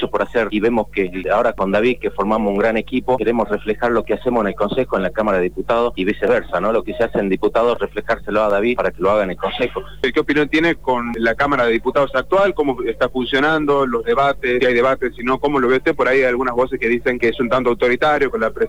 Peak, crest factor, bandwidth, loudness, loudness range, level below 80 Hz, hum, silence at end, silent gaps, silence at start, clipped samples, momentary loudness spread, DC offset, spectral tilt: -6 dBFS; 12 dB; 19.5 kHz; -18 LUFS; 2 LU; -40 dBFS; none; 0 s; none; 0 s; under 0.1%; 5 LU; 2%; -6.5 dB/octave